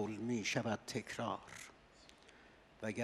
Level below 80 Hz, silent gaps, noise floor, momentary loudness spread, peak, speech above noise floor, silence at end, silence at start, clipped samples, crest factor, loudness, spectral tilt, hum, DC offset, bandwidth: -74 dBFS; none; -64 dBFS; 24 LU; -22 dBFS; 22 dB; 0 s; 0 s; under 0.1%; 20 dB; -41 LUFS; -4.5 dB/octave; none; under 0.1%; 13 kHz